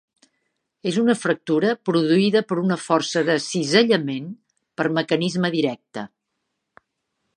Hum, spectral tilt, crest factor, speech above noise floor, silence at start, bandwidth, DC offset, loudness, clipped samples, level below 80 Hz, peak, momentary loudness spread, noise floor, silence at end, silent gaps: none; -5 dB/octave; 20 dB; 57 dB; 0.85 s; 11 kHz; under 0.1%; -21 LUFS; under 0.1%; -72 dBFS; -2 dBFS; 15 LU; -78 dBFS; 1.3 s; none